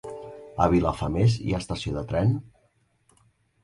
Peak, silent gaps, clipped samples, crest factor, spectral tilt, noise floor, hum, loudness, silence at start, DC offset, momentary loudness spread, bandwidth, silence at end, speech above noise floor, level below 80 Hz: -6 dBFS; none; under 0.1%; 20 dB; -7.5 dB/octave; -67 dBFS; none; -25 LUFS; 0.05 s; under 0.1%; 15 LU; 11.5 kHz; 1.15 s; 43 dB; -42 dBFS